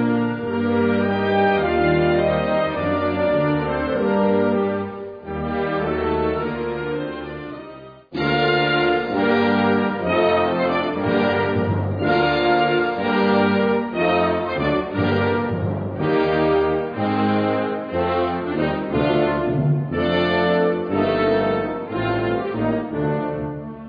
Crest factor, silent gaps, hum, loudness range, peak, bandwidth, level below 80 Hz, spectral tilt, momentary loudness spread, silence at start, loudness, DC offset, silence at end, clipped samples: 14 dB; none; none; 3 LU; -6 dBFS; 5 kHz; -44 dBFS; -9 dB/octave; 7 LU; 0 s; -20 LUFS; under 0.1%; 0 s; under 0.1%